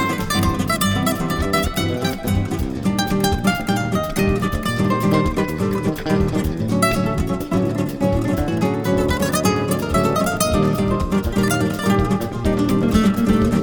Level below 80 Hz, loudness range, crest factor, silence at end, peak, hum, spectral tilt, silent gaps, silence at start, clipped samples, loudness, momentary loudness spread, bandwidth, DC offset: -30 dBFS; 2 LU; 16 dB; 0 s; -2 dBFS; none; -5.5 dB/octave; none; 0 s; under 0.1%; -19 LUFS; 4 LU; over 20 kHz; under 0.1%